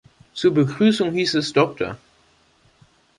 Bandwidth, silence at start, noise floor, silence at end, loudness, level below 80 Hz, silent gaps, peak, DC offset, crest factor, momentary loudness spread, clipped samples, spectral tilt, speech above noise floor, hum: 11.5 kHz; 0.35 s; -59 dBFS; 1.2 s; -20 LUFS; -58 dBFS; none; -2 dBFS; under 0.1%; 18 dB; 12 LU; under 0.1%; -5.5 dB/octave; 39 dB; none